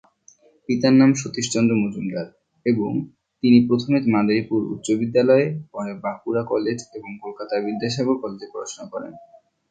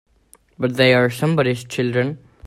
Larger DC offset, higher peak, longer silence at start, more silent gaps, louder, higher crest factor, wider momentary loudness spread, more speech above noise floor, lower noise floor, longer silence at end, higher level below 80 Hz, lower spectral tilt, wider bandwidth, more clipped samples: neither; about the same, -4 dBFS vs -2 dBFS; about the same, 0.7 s vs 0.6 s; neither; second, -21 LUFS vs -18 LUFS; about the same, 18 dB vs 18 dB; first, 17 LU vs 10 LU; about the same, 34 dB vs 36 dB; about the same, -55 dBFS vs -54 dBFS; first, 0.5 s vs 0 s; second, -62 dBFS vs -56 dBFS; about the same, -6 dB/octave vs -6 dB/octave; second, 9.2 kHz vs 14.5 kHz; neither